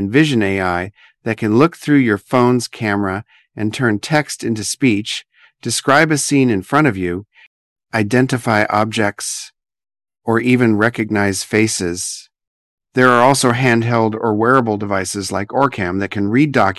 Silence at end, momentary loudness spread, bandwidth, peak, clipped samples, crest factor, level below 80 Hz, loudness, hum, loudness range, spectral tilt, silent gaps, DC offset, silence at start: 0.05 s; 11 LU; 12.5 kHz; 0 dBFS; under 0.1%; 16 dB; -46 dBFS; -16 LUFS; none; 3 LU; -5 dB/octave; 7.47-7.76 s, 12.47-12.78 s; under 0.1%; 0 s